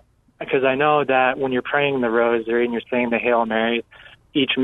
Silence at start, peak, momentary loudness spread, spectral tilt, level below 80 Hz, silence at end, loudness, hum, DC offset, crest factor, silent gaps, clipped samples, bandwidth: 0.4 s; -4 dBFS; 6 LU; -7.5 dB/octave; -58 dBFS; 0 s; -20 LUFS; none; under 0.1%; 16 dB; none; under 0.1%; 4 kHz